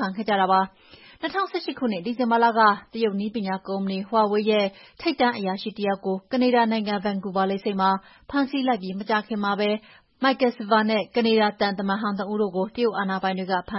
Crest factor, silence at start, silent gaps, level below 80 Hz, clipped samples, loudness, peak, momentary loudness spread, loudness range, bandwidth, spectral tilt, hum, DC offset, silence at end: 18 dB; 0 s; none; -62 dBFS; under 0.1%; -24 LUFS; -6 dBFS; 8 LU; 2 LU; 5.8 kHz; -9.5 dB/octave; none; under 0.1%; 0 s